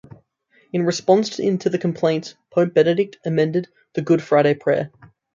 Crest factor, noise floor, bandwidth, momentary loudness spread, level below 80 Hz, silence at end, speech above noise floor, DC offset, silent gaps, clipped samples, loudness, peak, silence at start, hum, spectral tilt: 18 dB; -60 dBFS; 7.6 kHz; 10 LU; -66 dBFS; 0.45 s; 41 dB; under 0.1%; none; under 0.1%; -20 LUFS; -2 dBFS; 0.75 s; none; -6.5 dB/octave